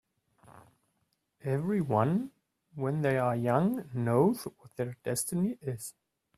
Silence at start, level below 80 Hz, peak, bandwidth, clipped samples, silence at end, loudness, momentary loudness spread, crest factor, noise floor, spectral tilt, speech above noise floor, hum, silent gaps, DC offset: 0.5 s; -68 dBFS; -12 dBFS; 15.5 kHz; under 0.1%; 0.5 s; -31 LUFS; 14 LU; 20 dB; -78 dBFS; -6.5 dB/octave; 48 dB; none; none; under 0.1%